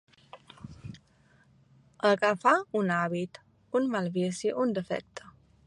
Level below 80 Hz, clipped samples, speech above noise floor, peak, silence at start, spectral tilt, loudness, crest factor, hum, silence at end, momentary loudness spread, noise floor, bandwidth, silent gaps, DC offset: -66 dBFS; under 0.1%; 35 dB; -8 dBFS; 0.35 s; -5.5 dB/octave; -29 LUFS; 22 dB; none; 0.5 s; 22 LU; -63 dBFS; 11.5 kHz; none; under 0.1%